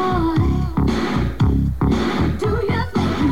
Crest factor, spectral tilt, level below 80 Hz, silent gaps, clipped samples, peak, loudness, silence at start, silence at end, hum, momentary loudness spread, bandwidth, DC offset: 12 dB; -7.5 dB/octave; -26 dBFS; none; under 0.1%; -6 dBFS; -19 LUFS; 0 s; 0 s; none; 2 LU; 15.5 kHz; 2%